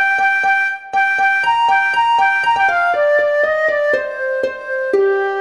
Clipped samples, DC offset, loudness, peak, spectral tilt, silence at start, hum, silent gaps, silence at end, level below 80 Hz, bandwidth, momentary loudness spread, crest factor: under 0.1%; 0.2%; -15 LUFS; -4 dBFS; -2.5 dB/octave; 0 s; none; none; 0 s; -60 dBFS; 11.5 kHz; 6 LU; 10 dB